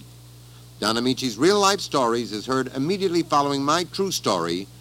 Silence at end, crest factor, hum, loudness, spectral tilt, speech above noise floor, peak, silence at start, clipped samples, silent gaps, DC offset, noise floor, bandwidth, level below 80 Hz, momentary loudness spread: 0 s; 20 dB; 60 Hz at -45 dBFS; -22 LUFS; -4 dB/octave; 23 dB; -4 dBFS; 0 s; under 0.1%; none; under 0.1%; -45 dBFS; 17 kHz; -56 dBFS; 6 LU